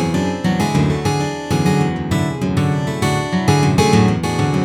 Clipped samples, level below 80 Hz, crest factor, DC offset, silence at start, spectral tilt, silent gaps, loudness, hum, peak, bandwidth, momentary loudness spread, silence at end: under 0.1%; -38 dBFS; 14 dB; under 0.1%; 0 s; -6 dB/octave; none; -17 LUFS; none; -2 dBFS; 15 kHz; 6 LU; 0 s